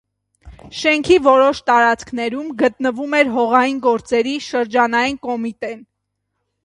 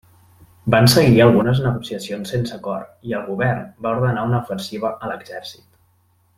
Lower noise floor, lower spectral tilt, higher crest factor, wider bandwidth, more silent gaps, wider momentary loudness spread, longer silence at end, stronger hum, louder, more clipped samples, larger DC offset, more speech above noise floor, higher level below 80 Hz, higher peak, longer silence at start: first, -75 dBFS vs -60 dBFS; second, -4 dB/octave vs -6 dB/octave; about the same, 18 dB vs 18 dB; second, 11 kHz vs 16 kHz; neither; second, 11 LU vs 17 LU; about the same, 0.85 s vs 0.85 s; neither; first, -16 LUFS vs -19 LUFS; neither; neither; first, 58 dB vs 41 dB; about the same, -50 dBFS vs -48 dBFS; about the same, 0 dBFS vs -2 dBFS; second, 0.45 s vs 0.65 s